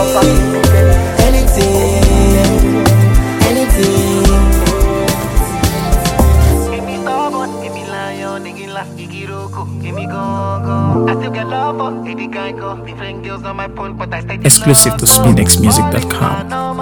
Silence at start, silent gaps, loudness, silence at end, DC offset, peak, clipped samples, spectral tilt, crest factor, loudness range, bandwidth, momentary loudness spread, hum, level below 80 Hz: 0 s; none; -12 LUFS; 0 s; under 0.1%; 0 dBFS; 0.3%; -4.5 dB/octave; 12 dB; 11 LU; over 20 kHz; 16 LU; none; -18 dBFS